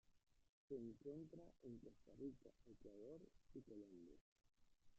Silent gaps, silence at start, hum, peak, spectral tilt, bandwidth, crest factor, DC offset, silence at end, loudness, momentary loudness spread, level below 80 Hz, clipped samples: 0.49-0.68 s, 4.21-4.36 s; 0.05 s; none; -42 dBFS; -9.5 dB/octave; 7.6 kHz; 18 dB; under 0.1%; 0 s; -60 LUFS; 11 LU; -78 dBFS; under 0.1%